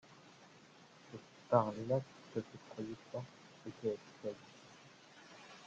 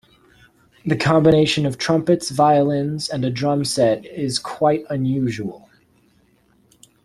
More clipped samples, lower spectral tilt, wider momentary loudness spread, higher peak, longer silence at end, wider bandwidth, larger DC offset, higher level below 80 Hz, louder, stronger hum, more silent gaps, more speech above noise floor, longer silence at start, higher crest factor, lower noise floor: neither; first, -7 dB/octave vs -5.5 dB/octave; first, 26 LU vs 9 LU; second, -16 dBFS vs -2 dBFS; second, 0 s vs 1.45 s; second, 8.8 kHz vs 13 kHz; neither; second, -80 dBFS vs -52 dBFS; second, -40 LUFS vs -19 LUFS; neither; neither; second, 22 dB vs 40 dB; second, 0.1 s vs 0.85 s; first, 28 dB vs 18 dB; first, -62 dBFS vs -58 dBFS